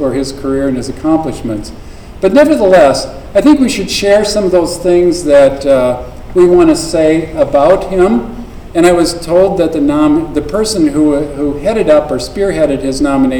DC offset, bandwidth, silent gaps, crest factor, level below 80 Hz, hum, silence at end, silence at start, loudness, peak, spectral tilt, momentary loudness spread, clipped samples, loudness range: under 0.1%; 18.5 kHz; none; 10 dB; -30 dBFS; none; 0 s; 0 s; -10 LUFS; 0 dBFS; -5.5 dB/octave; 9 LU; 0.9%; 2 LU